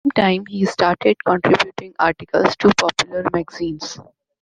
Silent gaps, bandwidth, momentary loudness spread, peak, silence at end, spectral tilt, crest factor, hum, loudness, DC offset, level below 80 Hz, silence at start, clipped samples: none; 9.8 kHz; 11 LU; 0 dBFS; 0.4 s; -4.5 dB/octave; 18 dB; none; -18 LUFS; under 0.1%; -52 dBFS; 0.05 s; under 0.1%